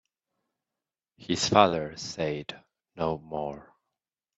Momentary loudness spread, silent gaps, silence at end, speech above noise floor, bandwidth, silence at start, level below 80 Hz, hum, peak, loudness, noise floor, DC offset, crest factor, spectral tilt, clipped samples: 19 LU; none; 0.75 s; over 62 dB; 8.4 kHz; 1.2 s; -62 dBFS; none; -2 dBFS; -28 LUFS; under -90 dBFS; under 0.1%; 28 dB; -4 dB/octave; under 0.1%